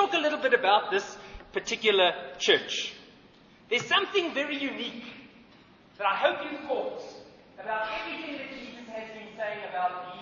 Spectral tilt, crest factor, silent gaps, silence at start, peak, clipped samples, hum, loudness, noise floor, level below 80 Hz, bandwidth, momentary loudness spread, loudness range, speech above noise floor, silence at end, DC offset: -2 dB/octave; 22 dB; none; 0 s; -8 dBFS; under 0.1%; none; -28 LUFS; -56 dBFS; -64 dBFS; 7.4 kHz; 18 LU; 9 LU; 27 dB; 0 s; under 0.1%